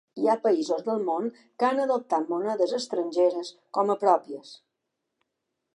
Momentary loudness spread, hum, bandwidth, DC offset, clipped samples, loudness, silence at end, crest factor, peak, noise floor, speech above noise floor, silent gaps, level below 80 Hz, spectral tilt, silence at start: 8 LU; none; 11 kHz; under 0.1%; under 0.1%; -26 LUFS; 1.2 s; 20 dB; -8 dBFS; -82 dBFS; 56 dB; none; -86 dBFS; -5 dB/octave; 0.15 s